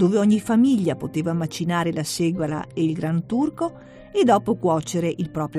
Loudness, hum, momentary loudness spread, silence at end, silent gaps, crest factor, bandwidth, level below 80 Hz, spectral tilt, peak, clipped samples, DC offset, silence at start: -22 LUFS; none; 8 LU; 0 s; none; 16 dB; 13.5 kHz; -56 dBFS; -6.5 dB/octave; -6 dBFS; under 0.1%; under 0.1%; 0 s